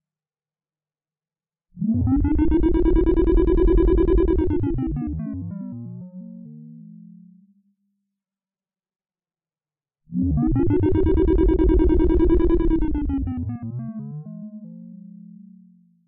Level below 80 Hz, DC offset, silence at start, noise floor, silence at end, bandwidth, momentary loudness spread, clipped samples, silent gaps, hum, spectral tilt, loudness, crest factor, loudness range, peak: -26 dBFS; under 0.1%; 1.75 s; under -90 dBFS; 1 s; 3.9 kHz; 20 LU; under 0.1%; none; none; -12.5 dB/octave; -21 LUFS; 12 dB; 13 LU; -8 dBFS